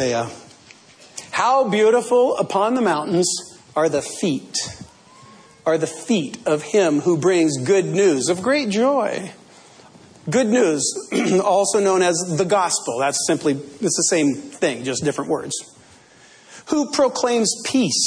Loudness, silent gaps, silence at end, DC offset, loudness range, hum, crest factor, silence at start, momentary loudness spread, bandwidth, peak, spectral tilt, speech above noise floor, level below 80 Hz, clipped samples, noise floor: -19 LUFS; none; 0 s; under 0.1%; 4 LU; none; 14 dB; 0 s; 9 LU; 11 kHz; -6 dBFS; -4 dB/octave; 30 dB; -64 dBFS; under 0.1%; -49 dBFS